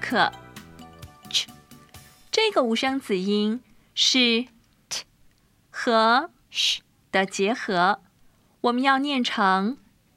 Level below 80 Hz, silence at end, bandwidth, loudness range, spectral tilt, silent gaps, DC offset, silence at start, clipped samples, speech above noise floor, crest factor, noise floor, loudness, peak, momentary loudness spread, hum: -64 dBFS; 0.4 s; 16 kHz; 3 LU; -3 dB/octave; none; under 0.1%; 0 s; under 0.1%; 37 dB; 20 dB; -60 dBFS; -23 LUFS; -6 dBFS; 13 LU; none